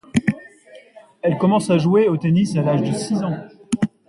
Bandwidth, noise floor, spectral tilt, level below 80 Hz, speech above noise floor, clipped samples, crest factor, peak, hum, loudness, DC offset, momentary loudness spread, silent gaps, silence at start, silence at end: 11.5 kHz; -46 dBFS; -7 dB/octave; -54 dBFS; 28 dB; under 0.1%; 16 dB; -4 dBFS; none; -19 LUFS; under 0.1%; 10 LU; none; 0.15 s; 0.2 s